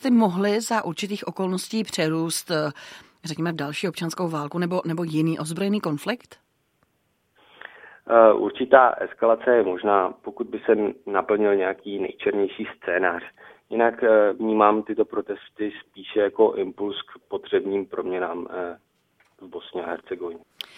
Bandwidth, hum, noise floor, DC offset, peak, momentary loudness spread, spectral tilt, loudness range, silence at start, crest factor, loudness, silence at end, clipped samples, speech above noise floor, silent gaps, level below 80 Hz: 16 kHz; none; -70 dBFS; under 0.1%; 0 dBFS; 16 LU; -5.5 dB/octave; 8 LU; 0 s; 22 dB; -23 LUFS; 0.4 s; under 0.1%; 47 dB; none; -68 dBFS